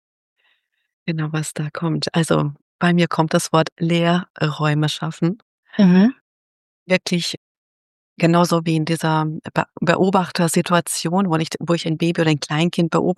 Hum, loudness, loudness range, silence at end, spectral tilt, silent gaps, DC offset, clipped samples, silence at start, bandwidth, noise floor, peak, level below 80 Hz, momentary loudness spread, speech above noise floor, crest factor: none; -19 LUFS; 2 LU; 0.05 s; -5.5 dB/octave; 2.62-2.79 s, 3.72-3.76 s, 4.30-4.34 s, 5.42-5.63 s, 6.21-6.86 s, 7.37-8.16 s; under 0.1%; under 0.1%; 1.05 s; 12.5 kHz; -66 dBFS; -2 dBFS; -62 dBFS; 8 LU; 47 dB; 18 dB